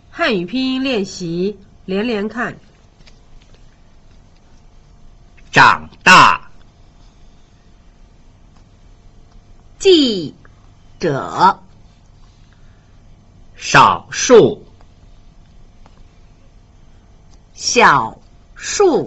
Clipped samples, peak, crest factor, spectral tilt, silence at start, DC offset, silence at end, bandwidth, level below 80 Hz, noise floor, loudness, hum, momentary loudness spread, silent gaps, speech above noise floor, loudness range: under 0.1%; 0 dBFS; 18 dB; -3.5 dB/octave; 0.15 s; under 0.1%; 0 s; 8.2 kHz; -44 dBFS; -46 dBFS; -13 LUFS; none; 15 LU; none; 32 dB; 11 LU